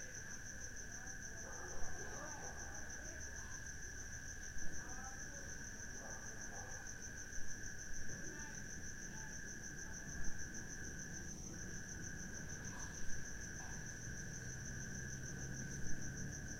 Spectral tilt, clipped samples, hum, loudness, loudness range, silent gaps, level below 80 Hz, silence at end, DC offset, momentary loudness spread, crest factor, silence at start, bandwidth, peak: -3 dB/octave; under 0.1%; none; -49 LUFS; 1 LU; none; -54 dBFS; 0 s; under 0.1%; 2 LU; 18 dB; 0 s; 16.5 kHz; -26 dBFS